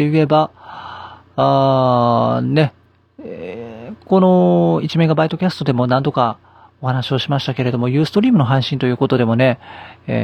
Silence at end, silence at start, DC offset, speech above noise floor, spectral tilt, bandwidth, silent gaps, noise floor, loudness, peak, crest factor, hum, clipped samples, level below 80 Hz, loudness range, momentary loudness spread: 0 s; 0 s; under 0.1%; 20 dB; -8 dB/octave; 9 kHz; none; -35 dBFS; -16 LUFS; 0 dBFS; 16 dB; none; under 0.1%; -56 dBFS; 2 LU; 19 LU